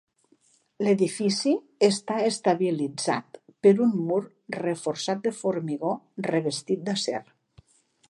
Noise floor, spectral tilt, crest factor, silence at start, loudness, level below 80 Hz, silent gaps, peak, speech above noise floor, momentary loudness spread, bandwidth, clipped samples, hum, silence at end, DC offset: -64 dBFS; -5 dB/octave; 18 dB; 0.8 s; -26 LUFS; -74 dBFS; none; -8 dBFS; 39 dB; 8 LU; 11.5 kHz; under 0.1%; none; 0.85 s; under 0.1%